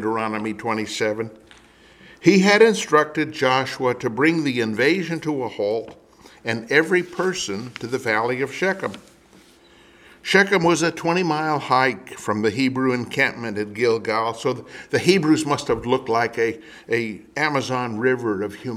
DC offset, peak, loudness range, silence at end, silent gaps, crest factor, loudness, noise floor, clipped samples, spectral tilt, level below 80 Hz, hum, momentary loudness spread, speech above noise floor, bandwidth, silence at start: under 0.1%; 0 dBFS; 4 LU; 0 s; none; 22 dB; -21 LUFS; -51 dBFS; under 0.1%; -5 dB/octave; -58 dBFS; none; 11 LU; 30 dB; 15 kHz; 0 s